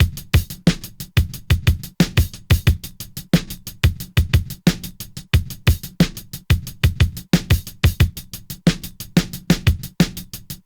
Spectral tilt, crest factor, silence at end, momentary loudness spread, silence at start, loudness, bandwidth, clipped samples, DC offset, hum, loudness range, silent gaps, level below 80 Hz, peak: -5.5 dB/octave; 16 dB; 0.1 s; 11 LU; 0 s; -20 LUFS; over 20 kHz; under 0.1%; under 0.1%; none; 1 LU; none; -28 dBFS; -4 dBFS